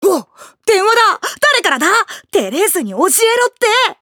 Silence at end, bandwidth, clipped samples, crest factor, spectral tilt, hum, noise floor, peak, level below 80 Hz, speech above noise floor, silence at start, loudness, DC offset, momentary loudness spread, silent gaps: 0.1 s; over 20 kHz; under 0.1%; 14 dB; -1 dB/octave; none; -33 dBFS; 0 dBFS; -64 dBFS; 20 dB; 0 s; -13 LUFS; under 0.1%; 7 LU; none